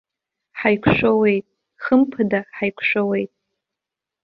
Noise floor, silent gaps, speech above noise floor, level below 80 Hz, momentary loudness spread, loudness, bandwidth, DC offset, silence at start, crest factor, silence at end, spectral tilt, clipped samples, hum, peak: -86 dBFS; none; 67 dB; -50 dBFS; 10 LU; -19 LUFS; 5.4 kHz; under 0.1%; 0.55 s; 20 dB; 1 s; -9 dB/octave; under 0.1%; none; -2 dBFS